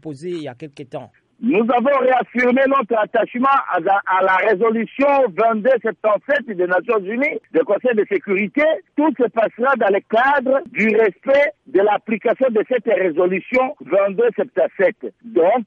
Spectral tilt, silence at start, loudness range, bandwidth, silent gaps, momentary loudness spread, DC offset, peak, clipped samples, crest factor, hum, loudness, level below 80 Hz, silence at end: -7 dB/octave; 0.05 s; 2 LU; 7.2 kHz; none; 5 LU; under 0.1%; -6 dBFS; under 0.1%; 12 dB; none; -17 LUFS; -64 dBFS; 0 s